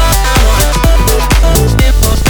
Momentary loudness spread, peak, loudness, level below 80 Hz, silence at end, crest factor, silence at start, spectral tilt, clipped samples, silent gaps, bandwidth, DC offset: 1 LU; 0 dBFS; -10 LUFS; -10 dBFS; 0 s; 8 dB; 0 s; -4 dB/octave; under 0.1%; none; over 20 kHz; under 0.1%